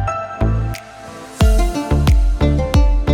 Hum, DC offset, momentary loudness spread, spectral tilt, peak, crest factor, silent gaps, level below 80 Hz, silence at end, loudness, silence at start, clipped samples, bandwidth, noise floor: none; under 0.1%; 16 LU; -6.5 dB/octave; -2 dBFS; 14 dB; none; -16 dBFS; 0 s; -17 LUFS; 0 s; under 0.1%; 15 kHz; -34 dBFS